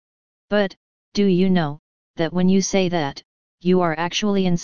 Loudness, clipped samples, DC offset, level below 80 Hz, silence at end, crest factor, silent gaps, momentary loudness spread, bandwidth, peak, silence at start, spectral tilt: -21 LUFS; under 0.1%; 2%; -50 dBFS; 0 s; 16 dB; 0.77-1.12 s, 1.79-2.14 s, 3.25-3.58 s; 10 LU; 7.2 kHz; -4 dBFS; 0.45 s; -5.5 dB/octave